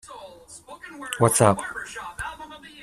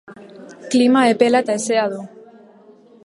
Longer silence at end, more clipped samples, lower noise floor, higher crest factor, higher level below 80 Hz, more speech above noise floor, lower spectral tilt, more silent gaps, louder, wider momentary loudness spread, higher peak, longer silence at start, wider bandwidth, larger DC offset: second, 0 s vs 1 s; neither; about the same, -45 dBFS vs -47 dBFS; first, 24 dB vs 18 dB; first, -54 dBFS vs -70 dBFS; second, 22 dB vs 32 dB; about the same, -4.5 dB/octave vs -4 dB/octave; neither; second, -23 LUFS vs -16 LUFS; first, 25 LU vs 20 LU; about the same, -2 dBFS vs 0 dBFS; about the same, 0.05 s vs 0.1 s; first, 15 kHz vs 11.5 kHz; neither